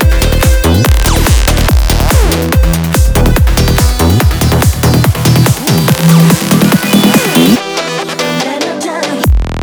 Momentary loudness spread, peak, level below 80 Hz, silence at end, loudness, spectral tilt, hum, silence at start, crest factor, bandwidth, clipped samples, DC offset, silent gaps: 7 LU; 0 dBFS; -14 dBFS; 0 s; -9 LUFS; -5 dB/octave; none; 0 s; 8 dB; over 20 kHz; under 0.1%; under 0.1%; none